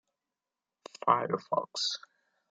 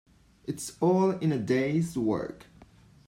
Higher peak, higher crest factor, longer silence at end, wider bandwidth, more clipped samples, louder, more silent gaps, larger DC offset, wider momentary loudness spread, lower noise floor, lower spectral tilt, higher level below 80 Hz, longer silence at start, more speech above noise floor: first, -10 dBFS vs -14 dBFS; first, 24 dB vs 16 dB; about the same, 0.55 s vs 0.45 s; second, 9.4 kHz vs 16 kHz; neither; second, -31 LUFS vs -28 LUFS; neither; neither; second, 11 LU vs 14 LU; first, under -90 dBFS vs -55 dBFS; second, -3 dB/octave vs -6.5 dB/octave; second, -84 dBFS vs -62 dBFS; first, 1.05 s vs 0.45 s; first, over 59 dB vs 28 dB